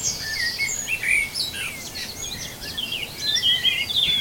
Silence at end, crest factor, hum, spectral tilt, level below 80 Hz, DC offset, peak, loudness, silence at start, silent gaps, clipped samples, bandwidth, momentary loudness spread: 0 s; 18 dB; none; 0 dB/octave; -48 dBFS; under 0.1%; -8 dBFS; -22 LUFS; 0 s; none; under 0.1%; 19.5 kHz; 12 LU